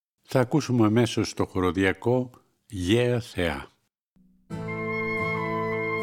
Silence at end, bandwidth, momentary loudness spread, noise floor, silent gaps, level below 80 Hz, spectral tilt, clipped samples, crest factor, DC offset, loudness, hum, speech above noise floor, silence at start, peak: 0 s; 16 kHz; 12 LU; -66 dBFS; 4.01-4.16 s; -52 dBFS; -6 dB/octave; under 0.1%; 20 dB; under 0.1%; -26 LUFS; none; 41 dB; 0.3 s; -6 dBFS